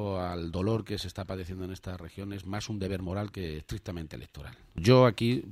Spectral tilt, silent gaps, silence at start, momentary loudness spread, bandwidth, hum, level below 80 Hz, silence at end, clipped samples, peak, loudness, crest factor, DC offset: -6.5 dB/octave; none; 0 s; 19 LU; 14.5 kHz; none; -50 dBFS; 0 s; under 0.1%; -8 dBFS; -30 LUFS; 22 dB; under 0.1%